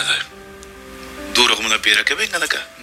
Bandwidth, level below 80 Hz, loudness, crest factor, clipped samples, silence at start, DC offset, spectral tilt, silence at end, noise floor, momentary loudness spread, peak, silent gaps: 16.5 kHz; -48 dBFS; -16 LUFS; 20 dB; under 0.1%; 0 s; under 0.1%; 0 dB/octave; 0 s; -38 dBFS; 21 LU; 0 dBFS; none